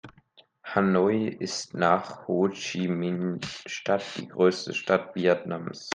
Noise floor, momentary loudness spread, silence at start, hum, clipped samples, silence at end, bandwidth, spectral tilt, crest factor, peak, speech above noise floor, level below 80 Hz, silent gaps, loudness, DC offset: -60 dBFS; 10 LU; 0.05 s; none; under 0.1%; 0 s; 9.8 kHz; -5.5 dB/octave; 20 dB; -6 dBFS; 33 dB; -70 dBFS; none; -27 LUFS; under 0.1%